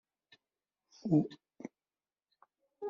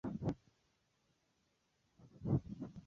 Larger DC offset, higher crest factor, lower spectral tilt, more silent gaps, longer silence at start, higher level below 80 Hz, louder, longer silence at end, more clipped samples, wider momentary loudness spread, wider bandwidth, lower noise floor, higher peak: neither; about the same, 22 dB vs 22 dB; about the same, -9.5 dB/octave vs -10.5 dB/octave; neither; first, 1.05 s vs 0.05 s; second, -76 dBFS vs -62 dBFS; first, -34 LUFS vs -42 LUFS; about the same, 0 s vs 0.05 s; neither; first, 20 LU vs 11 LU; about the same, 7 kHz vs 7.2 kHz; first, under -90 dBFS vs -80 dBFS; first, -18 dBFS vs -24 dBFS